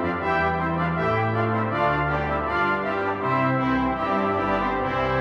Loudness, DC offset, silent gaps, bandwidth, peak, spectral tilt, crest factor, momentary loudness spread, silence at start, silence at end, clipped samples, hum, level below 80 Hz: -23 LUFS; under 0.1%; none; 8 kHz; -10 dBFS; -8 dB/octave; 14 dB; 2 LU; 0 s; 0 s; under 0.1%; none; -42 dBFS